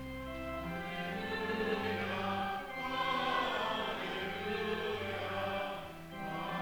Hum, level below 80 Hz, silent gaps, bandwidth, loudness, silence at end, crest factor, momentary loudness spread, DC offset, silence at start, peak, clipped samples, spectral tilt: none; -58 dBFS; none; over 20 kHz; -37 LUFS; 0 s; 18 dB; 8 LU; under 0.1%; 0 s; -20 dBFS; under 0.1%; -5 dB/octave